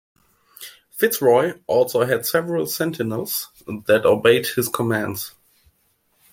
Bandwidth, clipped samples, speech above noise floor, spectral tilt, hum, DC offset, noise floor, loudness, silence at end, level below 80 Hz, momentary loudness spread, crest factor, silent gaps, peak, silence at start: 16.5 kHz; under 0.1%; 45 dB; -4.5 dB/octave; none; under 0.1%; -65 dBFS; -20 LUFS; 1.05 s; -62 dBFS; 16 LU; 20 dB; none; -2 dBFS; 0.6 s